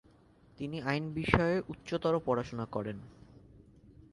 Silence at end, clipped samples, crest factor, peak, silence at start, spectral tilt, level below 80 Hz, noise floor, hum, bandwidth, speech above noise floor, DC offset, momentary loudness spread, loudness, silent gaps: 0.2 s; under 0.1%; 30 dB; -4 dBFS; 0.6 s; -7 dB/octave; -52 dBFS; -62 dBFS; none; 11.5 kHz; 29 dB; under 0.1%; 14 LU; -33 LUFS; none